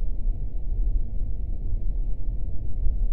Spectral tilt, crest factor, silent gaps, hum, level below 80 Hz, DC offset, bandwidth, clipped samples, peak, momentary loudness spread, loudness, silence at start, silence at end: -12 dB/octave; 12 dB; none; none; -26 dBFS; under 0.1%; 0.9 kHz; under 0.1%; -10 dBFS; 4 LU; -33 LUFS; 0 s; 0 s